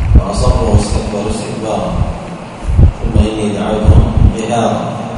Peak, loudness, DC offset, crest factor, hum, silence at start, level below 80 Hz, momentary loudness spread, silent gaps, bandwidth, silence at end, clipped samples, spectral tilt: 0 dBFS; -13 LUFS; under 0.1%; 12 dB; none; 0 s; -16 dBFS; 9 LU; none; 11 kHz; 0 s; 0.9%; -7 dB/octave